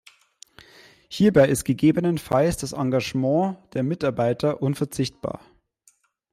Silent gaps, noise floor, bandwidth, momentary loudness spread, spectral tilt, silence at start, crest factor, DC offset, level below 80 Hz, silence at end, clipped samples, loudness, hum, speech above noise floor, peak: none; -62 dBFS; 15.5 kHz; 9 LU; -6.5 dB/octave; 1.1 s; 18 dB; under 0.1%; -52 dBFS; 0.95 s; under 0.1%; -23 LUFS; none; 40 dB; -6 dBFS